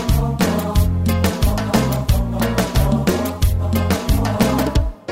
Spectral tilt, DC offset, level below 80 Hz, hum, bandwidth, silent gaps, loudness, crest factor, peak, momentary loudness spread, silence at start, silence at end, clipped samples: -6 dB/octave; under 0.1%; -22 dBFS; none; 16.5 kHz; none; -18 LUFS; 16 dB; -2 dBFS; 2 LU; 0 s; 0 s; under 0.1%